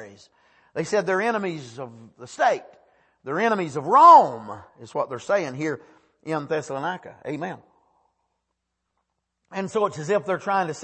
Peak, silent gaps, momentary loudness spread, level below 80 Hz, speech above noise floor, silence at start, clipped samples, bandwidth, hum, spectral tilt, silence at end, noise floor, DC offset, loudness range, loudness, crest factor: -2 dBFS; none; 23 LU; -72 dBFS; 57 dB; 0 s; under 0.1%; 8.8 kHz; none; -5 dB/octave; 0 s; -79 dBFS; under 0.1%; 13 LU; -22 LUFS; 20 dB